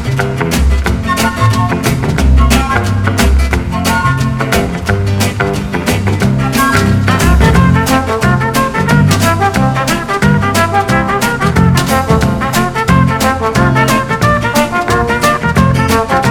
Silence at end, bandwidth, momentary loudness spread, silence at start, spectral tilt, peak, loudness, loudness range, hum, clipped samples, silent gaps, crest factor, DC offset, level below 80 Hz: 0 s; over 20 kHz; 4 LU; 0 s; -5.5 dB/octave; 0 dBFS; -11 LUFS; 2 LU; none; 0.5%; none; 10 dB; under 0.1%; -18 dBFS